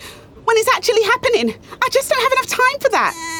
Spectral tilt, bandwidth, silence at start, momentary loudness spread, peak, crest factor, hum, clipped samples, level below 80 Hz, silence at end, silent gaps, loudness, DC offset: -2 dB/octave; over 20 kHz; 0 s; 5 LU; -4 dBFS; 14 dB; none; under 0.1%; -52 dBFS; 0 s; none; -16 LUFS; under 0.1%